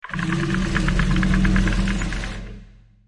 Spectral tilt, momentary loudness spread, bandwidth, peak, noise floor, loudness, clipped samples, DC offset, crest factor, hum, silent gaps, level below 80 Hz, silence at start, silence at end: -6 dB/octave; 12 LU; 11 kHz; -6 dBFS; -45 dBFS; -22 LUFS; under 0.1%; under 0.1%; 16 dB; none; none; -26 dBFS; 0.05 s; 0.4 s